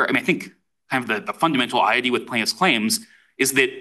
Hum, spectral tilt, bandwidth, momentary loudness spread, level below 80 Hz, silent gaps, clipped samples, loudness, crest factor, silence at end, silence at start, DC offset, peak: none; -3 dB/octave; 13 kHz; 8 LU; -68 dBFS; none; under 0.1%; -20 LUFS; 18 dB; 0 s; 0 s; under 0.1%; -4 dBFS